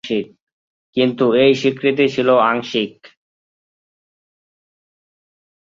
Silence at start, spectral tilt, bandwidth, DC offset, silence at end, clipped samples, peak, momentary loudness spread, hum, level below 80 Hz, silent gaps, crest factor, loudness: 0.05 s; -6 dB/octave; 7.6 kHz; under 0.1%; 2.55 s; under 0.1%; -2 dBFS; 11 LU; none; -62 dBFS; 0.42-0.93 s; 18 dB; -16 LUFS